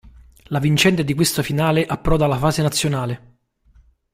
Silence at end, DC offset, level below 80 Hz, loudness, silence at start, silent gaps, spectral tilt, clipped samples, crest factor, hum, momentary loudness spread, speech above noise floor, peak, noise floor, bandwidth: 0.95 s; under 0.1%; -36 dBFS; -19 LUFS; 0.05 s; none; -5 dB/octave; under 0.1%; 18 dB; none; 9 LU; 36 dB; -2 dBFS; -54 dBFS; 16 kHz